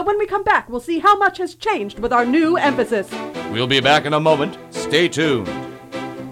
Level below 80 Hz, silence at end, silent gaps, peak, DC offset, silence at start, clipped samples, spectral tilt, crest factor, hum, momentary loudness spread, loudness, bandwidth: -48 dBFS; 0 s; none; -2 dBFS; under 0.1%; 0 s; under 0.1%; -4.5 dB/octave; 16 dB; none; 14 LU; -18 LUFS; 16 kHz